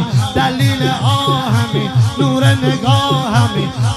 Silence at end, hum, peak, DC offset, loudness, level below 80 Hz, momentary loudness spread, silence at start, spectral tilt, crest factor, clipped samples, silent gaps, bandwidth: 0 s; none; 0 dBFS; under 0.1%; -14 LUFS; -42 dBFS; 3 LU; 0 s; -6 dB/octave; 14 dB; under 0.1%; none; 13.5 kHz